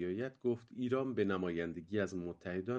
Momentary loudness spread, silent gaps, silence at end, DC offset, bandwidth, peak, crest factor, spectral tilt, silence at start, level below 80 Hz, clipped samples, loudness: 6 LU; none; 0 s; under 0.1%; 8.2 kHz; -22 dBFS; 16 dB; -7.5 dB/octave; 0 s; -70 dBFS; under 0.1%; -38 LUFS